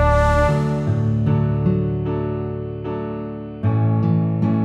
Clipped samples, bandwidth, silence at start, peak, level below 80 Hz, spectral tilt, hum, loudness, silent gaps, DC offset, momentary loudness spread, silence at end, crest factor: under 0.1%; 9.4 kHz; 0 s; -4 dBFS; -30 dBFS; -9 dB/octave; none; -20 LUFS; none; under 0.1%; 10 LU; 0 s; 14 dB